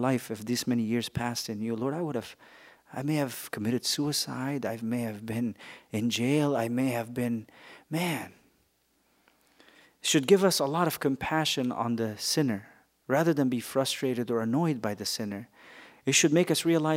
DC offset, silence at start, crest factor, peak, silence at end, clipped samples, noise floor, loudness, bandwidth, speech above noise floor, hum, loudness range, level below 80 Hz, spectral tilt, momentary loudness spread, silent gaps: under 0.1%; 0 s; 22 dB; -8 dBFS; 0 s; under 0.1%; -70 dBFS; -29 LUFS; 16 kHz; 42 dB; none; 5 LU; -66 dBFS; -4.5 dB/octave; 12 LU; none